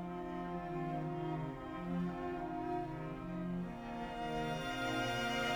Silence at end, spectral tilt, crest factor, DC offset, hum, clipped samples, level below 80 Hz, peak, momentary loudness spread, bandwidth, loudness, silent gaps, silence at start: 0 s; -5.5 dB/octave; 14 dB; under 0.1%; none; under 0.1%; -56 dBFS; -24 dBFS; 7 LU; over 20 kHz; -41 LUFS; none; 0 s